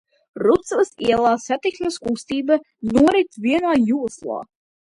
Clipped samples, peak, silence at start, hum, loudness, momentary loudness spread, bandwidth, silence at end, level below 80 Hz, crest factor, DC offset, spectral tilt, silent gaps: under 0.1%; -4 dBFS; 0.35 s; none; -20 LUFS; 9 LU; 11.5 kHz; 0.45 s; -52 dBFS; 16 dB; under 0.1%; -5 dB/octave; none